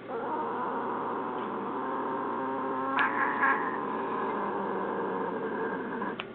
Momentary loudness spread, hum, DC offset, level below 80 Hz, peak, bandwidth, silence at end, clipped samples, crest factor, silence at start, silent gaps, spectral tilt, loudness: 7 LU; none; under 0.1%; -76 dBFS; -14 dBFS; 4.5 kHz; 0 s; under 0.1%; 18 dB; 0 s; none; -3.5 dB/octave; -31 LUFS